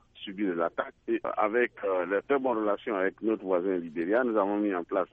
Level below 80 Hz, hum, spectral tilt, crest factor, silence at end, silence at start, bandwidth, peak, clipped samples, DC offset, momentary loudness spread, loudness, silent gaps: -68 dBFS; none; -8.5 dB/octave; 16 dB; 0.05 s; 0.15 s; 3.9 kHz; -12 dBFS; under 0.1%; under 0.1%; 5 LU; -29 LUFS; none